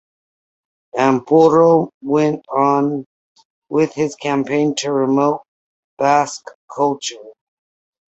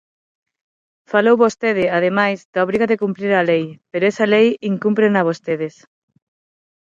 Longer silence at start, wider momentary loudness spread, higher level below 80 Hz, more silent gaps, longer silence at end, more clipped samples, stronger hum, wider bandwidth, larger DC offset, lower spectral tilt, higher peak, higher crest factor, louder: second, 0.95 s vs 1.1 s; first, 13 LU vs 7 LU; about the same, -62 dBFS vs -62 dBFS; first, 1.94-2.01 s, 3.06-3.36 s, 3.45-3.62 s, 5.48-5.97 s, 6.55-6.68 s vs 2.45-2.53 s; second, 0.8 s vs 1.15 s; neither; neither; about the same, 8.2 kHz vs 7.8 kHz; neither; about the same, -5.5 dB/octave vs -6.5 dB/octave; about the same, -2 dBFS vs -2 dBFS; about the same, 16 dB vs 16 dB; about the same, -17 LUFS vs -17 LUFS